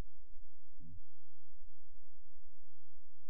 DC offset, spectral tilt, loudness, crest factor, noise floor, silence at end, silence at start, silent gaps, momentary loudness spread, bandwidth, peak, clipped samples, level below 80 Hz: 3%; -9.5 dB/octave; -62 LUFS; 10 dB; under -90 dBFS; 0 s; 0 s; none; 7 LU; 0.5 kHz; -28 dBFS; under 0.1%; -58 dBFS